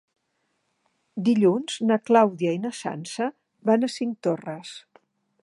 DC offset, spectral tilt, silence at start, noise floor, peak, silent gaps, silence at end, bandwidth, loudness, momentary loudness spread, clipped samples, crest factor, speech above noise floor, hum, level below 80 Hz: under 0.1%; -6 dB/octave; 1.15 s; -74 dBFS; -4 dBFS; none; 0.65 s; 11.5 kHz; -24 LUFS; 16 LU; under 0.1%; 20 dB; 51 dB; none; -78 dBFS